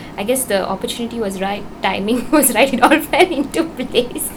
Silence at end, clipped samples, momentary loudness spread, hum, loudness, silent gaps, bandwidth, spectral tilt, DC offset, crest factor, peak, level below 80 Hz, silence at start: 0 s; under 0.1%; 9 LU; none; -16 LUFS; none; over 20 kHz; -3 dB/octave; under 0.1%; 16 dB; 0 dBFS; -42 dBFS; 0 s